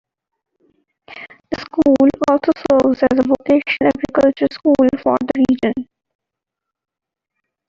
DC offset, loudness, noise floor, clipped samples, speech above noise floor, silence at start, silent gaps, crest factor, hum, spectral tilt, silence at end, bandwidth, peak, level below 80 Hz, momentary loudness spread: under 0.1%; -15 LUFS; -82 dBFS; under 0.1%; 68 dB; 1.1 s; none; 16 dB; none; -6.5 dB/octave; 1.85 s; 7.4 kHz; -2 dBFS; -50 dBFS; 14 LU